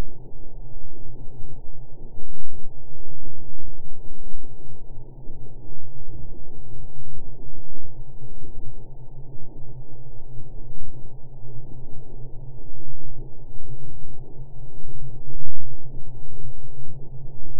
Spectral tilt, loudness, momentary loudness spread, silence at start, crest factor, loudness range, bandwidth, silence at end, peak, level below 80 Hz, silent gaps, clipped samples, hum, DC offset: -14.5 dB/octave; -43 LUFS; 4 LU; 0 s; 10 dB; 3 LU; 1 kHz; 0 s; 0 dBFS; -34 dBFS; none; under 0.1%; none; under 0.1%